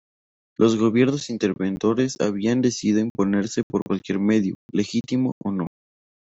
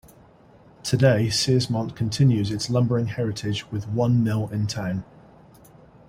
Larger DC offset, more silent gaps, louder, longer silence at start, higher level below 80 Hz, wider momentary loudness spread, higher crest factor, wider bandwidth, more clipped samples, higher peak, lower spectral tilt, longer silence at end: neither; first, 3.10-3.15 s, 3.63-3.70 s, 3.82-3.86 s, 4.55-4.69 s, 5.32-5.41 s vs none; about the same, -22 LUFS vs -23 LUFS; second, 0.6 s vs 0.85 s; second, -60 dBFS vs -54 dBFS; about the same, 7 LU vs 9 LU; about the same, 18 dB vs 18 dB; second, 8.2 kHz vs 15.5 kHz; neither; about the same, -4 dBFS vs -6 dBFS; about the same, -6 dB/octave vs -6 dB/octave; second, 0.6 s vs 1.05 s